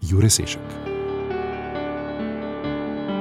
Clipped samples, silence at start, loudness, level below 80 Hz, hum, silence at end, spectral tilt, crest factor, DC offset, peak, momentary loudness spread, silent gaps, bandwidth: under 0.1%; 0 s; -24 LUFS; -42 dBFS; none; 0 s; -4.5 dB/octave; 20 dB; under 0.1%; -4 dBFS; 11 LU; none; 16 kHz